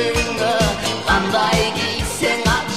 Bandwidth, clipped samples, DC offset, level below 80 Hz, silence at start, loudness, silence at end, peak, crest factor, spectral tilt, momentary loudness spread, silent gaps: 16 kHz; under 0.1%; 0.7%; -32 dBFS; 0 s; -18 LUFS; 0 s; -2 dBFS; 16 dB; -3.5 dB/octave; 4 LU; none